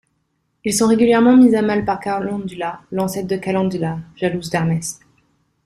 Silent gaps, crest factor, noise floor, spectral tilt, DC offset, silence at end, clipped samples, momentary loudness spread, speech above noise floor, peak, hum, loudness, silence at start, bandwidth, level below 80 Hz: none; 16 dB; -68 dBFS; -5.5 dB/octave; under 0.1%; 0.7 s; under 0.1%; 14 LU; 51 dB; -2 dBFS; none; -18 LUFS; 0.65 s; 14 kHz; -52 dBFS